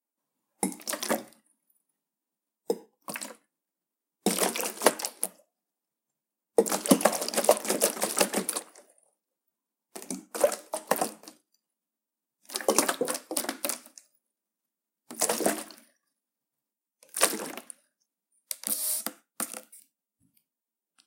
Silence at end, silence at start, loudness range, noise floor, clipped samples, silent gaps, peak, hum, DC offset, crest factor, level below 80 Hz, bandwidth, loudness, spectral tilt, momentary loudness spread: 1.25 s; 0.6 s; 8 LU; -90 dBFS; under 0.1%; none; 0 dBFS; none; under 0.1%; 32 dB; -78 dBFS; 17 kHz; -29 LUFS; -2 dB/octave; 14 LU